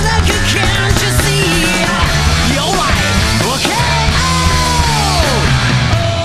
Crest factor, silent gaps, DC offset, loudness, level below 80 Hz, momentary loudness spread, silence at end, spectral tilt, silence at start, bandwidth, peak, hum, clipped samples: 12 dB; none; 0.4%; -12 LUFS; -20 dBFS; 1 LU; 0 s; -4 dB/octave; 0 s; 14 kHz; 0 dBFS; none; under 0.1%